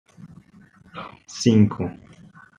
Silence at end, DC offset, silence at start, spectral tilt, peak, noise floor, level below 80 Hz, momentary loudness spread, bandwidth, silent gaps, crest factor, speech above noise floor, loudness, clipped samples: 0.65 s; under 0.1%; 0.2 s; -6.5 dB/octave; -4 dBFS; -52 dBFS; -60 dBFS; 21 LU; 10 kHz; none; 22 dB; 31 dB; -20 LUFS; under 0.1%